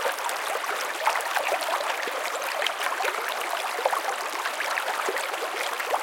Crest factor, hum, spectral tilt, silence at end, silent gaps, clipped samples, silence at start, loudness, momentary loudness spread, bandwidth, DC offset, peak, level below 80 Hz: 22 dB; none; 1.5 dB/octave; 0 s; none; under 0.1%; 0 s; -27 LUFS; 3 LU; 17 kHz; under 0.1%; -6 dBFS; -82 dBFS